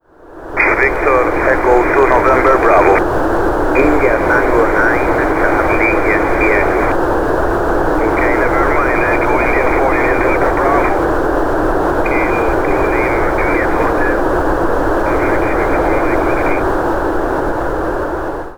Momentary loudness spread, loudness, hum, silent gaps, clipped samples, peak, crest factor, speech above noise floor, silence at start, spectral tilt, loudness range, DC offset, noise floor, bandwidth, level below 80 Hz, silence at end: 5 LU; -13 LUFS; none; none; under 0.1%; 0 dBFS; 12 dB; 23 dB; 0.25 s; -7 dB/octave; 3 LU; under 0.1%; -34 dBFS; over 20 kHz; -24 dBFS; 0 s